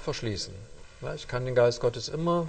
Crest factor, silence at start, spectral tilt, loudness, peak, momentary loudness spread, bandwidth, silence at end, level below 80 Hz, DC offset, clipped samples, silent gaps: 18 dB; 0 s; -5.5 dB/octave; -29 LUFS; -10 dBFS; 14 LU; 9 kHz; 0 s; -48 dBFS; under 0.1%; under 0.1%; none